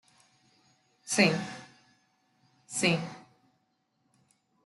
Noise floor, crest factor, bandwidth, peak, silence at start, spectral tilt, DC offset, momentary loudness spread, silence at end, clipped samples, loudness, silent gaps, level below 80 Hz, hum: -75 dBFS; 24 dB; 12 kHz; -10 dBFS; 1.05 s; -3.5 dB/octave; under 0.1%; 24 LU; 1.45 s; under 0.1%; -28 LUFS; none; -74 dBFS; none